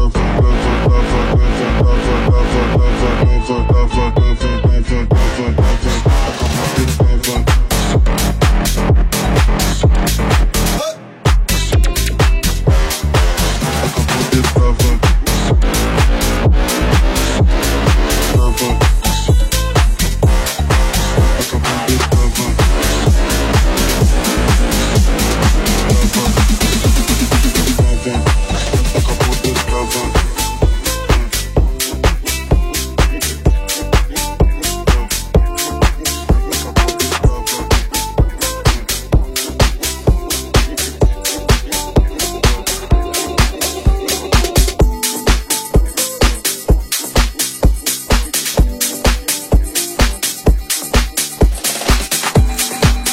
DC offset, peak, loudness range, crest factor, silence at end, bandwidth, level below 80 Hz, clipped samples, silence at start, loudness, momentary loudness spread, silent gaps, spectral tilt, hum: under 0.1%; 0 dBFS; 2 LU; 12 dB; 0 s; 16.5 kHz; -16 dBFS; under 0.1%; 0 s; -15 LUFS; 3 LU; none; -4.5 dB/octave; none